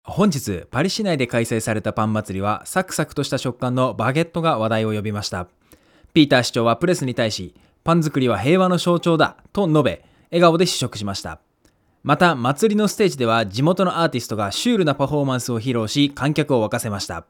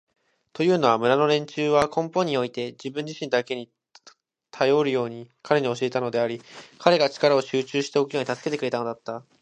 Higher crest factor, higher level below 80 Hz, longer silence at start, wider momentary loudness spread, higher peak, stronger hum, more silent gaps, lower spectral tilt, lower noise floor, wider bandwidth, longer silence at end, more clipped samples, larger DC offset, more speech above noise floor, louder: second, 18 dB vs 24 dB; first, -54 dBFS vs -64 dBFS; second, 0.05 s vs 0.55 s; second, 9 LU vs 13 LU; about the same, 0 dBFS vs 0 dBFS; neither; neither; about the same, -5.5 dB/octave vs -5 dB/octave; first, -60 dBFS vs -56 dBFS; first, 18.5 kHz vs 11 kHz; second, 0.05 s vs 0.2 s; neither; neither; first, 41 dB vs 32 dB; first, -20 LUFS vs -24 LUFS